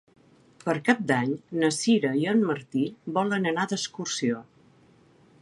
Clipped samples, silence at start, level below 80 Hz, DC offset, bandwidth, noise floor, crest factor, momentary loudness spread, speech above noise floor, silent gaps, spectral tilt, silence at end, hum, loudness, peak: under 0.1%; 0.65 s; -72 dBFS; under 0.1%; 11.5 kHz; -58 dBFS; 20 dB; 7 LU; 32 dB; none; -4.5 dB/octave; 1 s; none; -26 LUFS; -6 dBFS